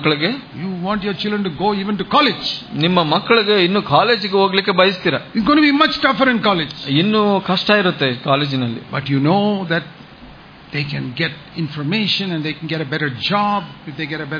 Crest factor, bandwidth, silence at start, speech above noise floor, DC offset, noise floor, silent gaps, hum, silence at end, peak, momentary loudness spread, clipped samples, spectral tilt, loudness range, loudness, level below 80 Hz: 18 dB; 5.2 kHz; 0 s; 23 dB; under 0.1%; -40 dBFS; none; none; 0 s; 0 dBFS; 10 LU; under 0.1%; -7 dB/octave; 7 LU; -17 LUFS; -52 dBFS